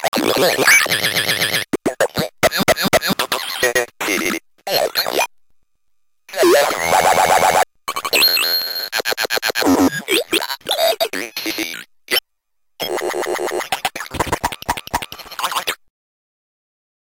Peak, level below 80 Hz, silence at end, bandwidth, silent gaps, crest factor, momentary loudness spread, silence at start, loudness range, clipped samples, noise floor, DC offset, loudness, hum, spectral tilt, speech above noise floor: -2 dBFS; -48 dBFS; 1.35 s; 17 kHz; 0.08-0.12 s; 16 dB; 11 LU; 0 s; 7 LU; under 0.1%; -68 dBFS; under 0.1%; -17 LUFS; none; -2 dB/octave; 54 dB